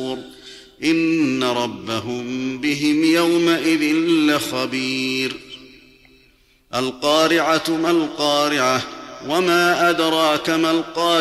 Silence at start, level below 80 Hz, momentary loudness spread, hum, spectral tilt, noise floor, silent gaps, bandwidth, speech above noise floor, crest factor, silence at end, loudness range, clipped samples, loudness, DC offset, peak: 0 s; -58 dBFS; 10 LU; none; -4 dB/octave; -55 dBFS; none; 14.5 kHz; 37 dB; 14 dB; 0 s; 4 LU; under 0.1%; -18 LUFS; under 0.1%; -6 dBFS